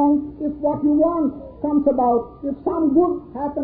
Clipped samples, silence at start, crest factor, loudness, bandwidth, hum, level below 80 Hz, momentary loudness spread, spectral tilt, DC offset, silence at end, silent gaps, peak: under 0.1%; 0 s; 14 dB; -20 LUFS; 2.1 kHz; none; -46 dBFS; 9 LU; -13 dB/octave; under 0.1%; 0 s; none; -6 dBFS